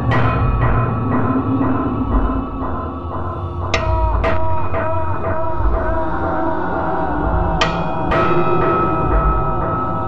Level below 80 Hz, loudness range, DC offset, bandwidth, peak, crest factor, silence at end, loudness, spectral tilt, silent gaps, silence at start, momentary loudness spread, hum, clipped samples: -24 dBFS; 3 LU; under 0.1%; 7.8 kHz; -4 dBFS; 14 dB; 0 s; -19 LUFS; -7.5 dB/octave; none; 0 s; 7 LU; none; under 0.1%